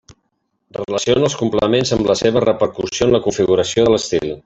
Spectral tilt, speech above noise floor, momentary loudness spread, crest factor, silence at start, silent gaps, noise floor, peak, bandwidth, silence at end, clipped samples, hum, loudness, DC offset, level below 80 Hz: -5 dB/octave; 53 dB; 6 LU; 14 dB; 0.1 s; none; -69 dBFS; -2 dBFS; 8.2 kHz; 0.05 s; under 0.1%; none; -16 LUFS; under 0.1%; -44 dBFS